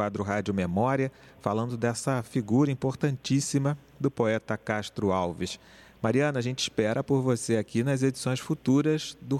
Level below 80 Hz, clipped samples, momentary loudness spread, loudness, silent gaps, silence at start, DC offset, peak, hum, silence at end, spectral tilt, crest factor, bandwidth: -60 dBFS; under 0.1%; 6 LU; -28 LUFS; none; 0 s; under 0.1%; -10 dBFS; none; 0 s; -6 dB/octave; 18 dB; 13.5 kHz